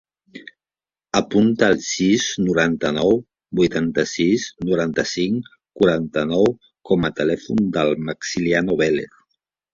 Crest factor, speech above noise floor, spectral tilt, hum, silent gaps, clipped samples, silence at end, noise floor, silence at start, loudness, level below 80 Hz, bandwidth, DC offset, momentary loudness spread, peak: 18 dB; over 71 dB; -5 dB/octave; none; none; under 0.1%; 0.7 s; under -90 dBFS; 0.35 s; -20 LUFS; -50 dBFS; 7.6 kHz; under 0.1%; 7 LU; -2 dBFS